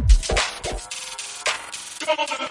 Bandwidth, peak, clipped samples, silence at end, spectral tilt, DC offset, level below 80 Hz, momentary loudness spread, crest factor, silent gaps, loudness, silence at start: 11.5 kHz; -4 dBFS; under 0.1%; 0 s; -3 dB/octave; under 0.1%; -24 dBFS; 11 LU; 20 dB; none; -25 LUFS; 0 s